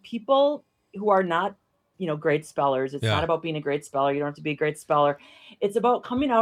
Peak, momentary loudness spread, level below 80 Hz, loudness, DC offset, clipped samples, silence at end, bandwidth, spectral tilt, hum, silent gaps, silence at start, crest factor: -8 dBFS; 9 LU; -60 dBFS; -25 LUFS; under 0.1%; under 0.1%; 0 s; 12.5 kHz; -6 dB/octave; none; none; 0.05 s; 18 dB